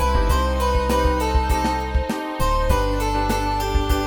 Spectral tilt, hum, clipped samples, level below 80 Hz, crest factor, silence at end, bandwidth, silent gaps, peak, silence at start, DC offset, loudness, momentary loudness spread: -5.5 dB/octave; none; under 0.1%; -22 dBFS; 14 dB; 0 s; 18.5 kHz; none; -4 dBFS; 0 s; under 0.1%; -21 LUFS; 4 LU